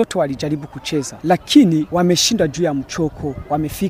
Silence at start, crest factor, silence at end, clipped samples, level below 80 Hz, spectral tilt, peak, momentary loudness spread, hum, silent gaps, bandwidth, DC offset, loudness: 0 s; 18 dB; 0 s; under 0.1%; -42 dBFS; -4.5 dB/octave; 0 dBFS; 11 LU; none; none; 16 kHz; under 0.1%; -17 LUFS